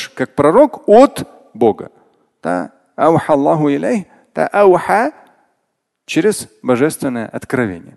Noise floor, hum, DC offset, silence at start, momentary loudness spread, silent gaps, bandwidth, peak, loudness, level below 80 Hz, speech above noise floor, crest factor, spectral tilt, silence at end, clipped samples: -71 dBFS; none; under 0.1%; 0 s; 15 LU; none; 12.5 kHz; 0 dBFS; -14 LUFS; -52 dBFS; 57 dB; 14 dB; -6 dB/octave; 0.15 s; under 0.1%